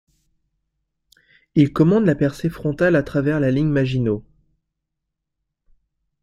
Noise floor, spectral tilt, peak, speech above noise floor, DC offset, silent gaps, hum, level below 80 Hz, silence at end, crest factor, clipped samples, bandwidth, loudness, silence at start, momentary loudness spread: -80 dBFS; -8.5 dB/octave; -4 dBFS; 62 dB; under 0.1%; none; none; -48 dBFS; 2 s; 18 dB; under 0.1%; 13 kHz; -19 LUFS; 1.55 s; 8 LU